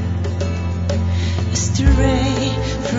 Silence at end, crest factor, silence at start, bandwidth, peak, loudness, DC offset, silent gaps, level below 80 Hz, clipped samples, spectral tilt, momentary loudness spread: 0 s; 16 dB; 0 s; 7.8 kHz; -2 dBFS; -19 LUFS; under 0.1%; none; -24 dBFS; under 0.1%; -5.5 dB/octave; 7 LU